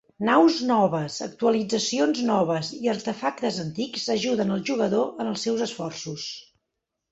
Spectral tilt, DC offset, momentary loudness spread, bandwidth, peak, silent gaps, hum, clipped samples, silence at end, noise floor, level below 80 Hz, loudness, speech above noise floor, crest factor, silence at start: -4.5 dB/octave; under 0.1%; 12 LU; 8.2 kHz; -6 dBFS; none; none; under 0.1%; 0.7 s; -82 dBFS; -66 dBFS; -25 LUFS; 58 dB; 20 dB; 0.2 s